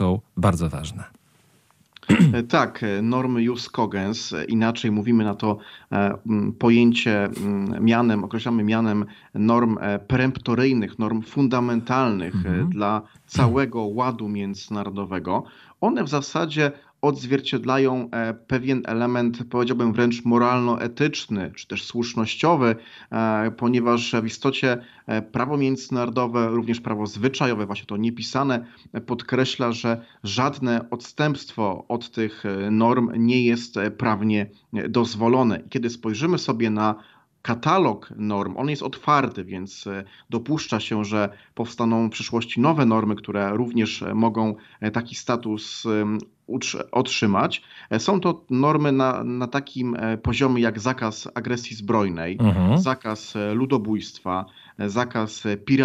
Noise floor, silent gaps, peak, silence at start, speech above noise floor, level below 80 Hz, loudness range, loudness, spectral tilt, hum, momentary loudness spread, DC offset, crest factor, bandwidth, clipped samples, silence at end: -60 dBFS; none; -4 dBFS; 0 s; 37 dB; -52 dBFS; 4 LU; -23 LUFS; -6 dB/octave; none; 9 LU; under 0.1%; 20 dB; 11 kHz; under 0.1%; 0 s